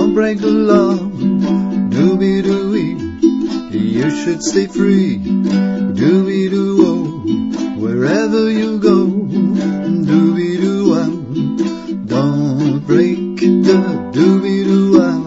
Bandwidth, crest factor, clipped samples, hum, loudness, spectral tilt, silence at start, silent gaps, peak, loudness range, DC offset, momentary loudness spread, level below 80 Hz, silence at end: 8 kHz; 14 dB; under 0.1%; none; -14 LUFS; -7 dB/octave; 0 s; none; 0 dBFS; 2 LU; under 0.1%; 7 LU; -46 dBFS; 0 s